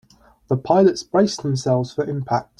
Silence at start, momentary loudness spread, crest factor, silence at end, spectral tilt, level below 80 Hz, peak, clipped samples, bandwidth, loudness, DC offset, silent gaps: 0.5 s; 9 LU; 16 dB; 0.15 s; -6.5 dB/octave; -56 dBFS; -4 dBFS; under 0.1%; 11 kHz; -20 LUFS; under 0.1%; none